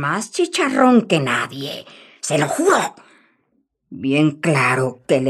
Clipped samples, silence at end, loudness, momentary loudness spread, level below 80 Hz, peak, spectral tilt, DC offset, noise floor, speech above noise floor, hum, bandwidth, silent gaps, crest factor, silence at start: under 0.1%; 0 s; -18 LUFS; 13 LU; -68 dBFS; -2 dBFS; -5 dB/octave; under 0.1%; -67 dBFS; 49 dB; none; 14 kHz; none; 16 dB; 0 s